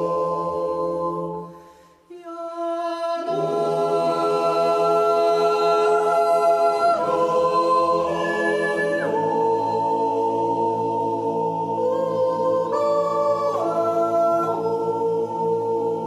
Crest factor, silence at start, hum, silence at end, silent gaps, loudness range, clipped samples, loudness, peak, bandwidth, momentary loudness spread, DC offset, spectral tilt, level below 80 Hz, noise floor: 12 dB; 0 s; none; 0 s; none; 6 LU; under 0.1%; -21 LUFS; -8 dBFS; 13.5 kHz; 7 LU; under 0.1%; -5.5 dB/octave; -64 dBFS; -49 dBFS